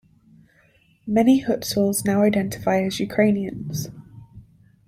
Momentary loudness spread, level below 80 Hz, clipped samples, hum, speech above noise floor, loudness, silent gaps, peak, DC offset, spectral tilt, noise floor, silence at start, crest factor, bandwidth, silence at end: 12 LU; -54 dBFS; under 0.1%; none; 38 dB; -21 LUFS; none; -6 dBFS; under 0.1%; -5.5 dB/octave; -59 dBFS; 1.05 s; 18 dB; 16 kHz; 0.45 s